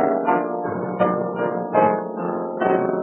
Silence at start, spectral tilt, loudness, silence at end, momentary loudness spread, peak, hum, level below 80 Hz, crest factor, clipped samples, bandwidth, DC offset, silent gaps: 0 s; -11.5 dB/octave; -22 LUFS; 0 s; 7 LU; -4 dBFS; none; -72 dBFS; 18 dB; under 0.1%; 3.9 kHz; under 0.1%; none